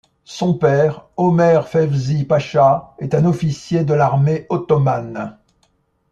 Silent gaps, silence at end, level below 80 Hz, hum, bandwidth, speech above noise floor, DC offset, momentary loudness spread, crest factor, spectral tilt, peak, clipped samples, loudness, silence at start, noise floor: none; 0.8 s; -52 dBFS; none; 7.6 kHz; 46 dB; under 0.1%; 8 LU; 14 dB; -8 dB/octave; -2 dBFS; under 0.1%; -17 LUFS; 0.3 s; -62 dBFS